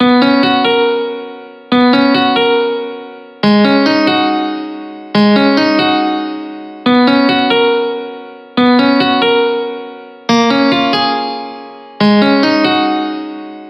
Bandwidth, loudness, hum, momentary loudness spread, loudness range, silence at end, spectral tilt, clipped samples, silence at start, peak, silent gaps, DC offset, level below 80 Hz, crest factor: 6.2 kHz; -12 LUFS; none; 16 LU; 1 LU; 0 s; -6 dB/octave; under 0.1%; 0 s; 0 dBFS; none; under 0.1%; -58 dBFS; 12 dB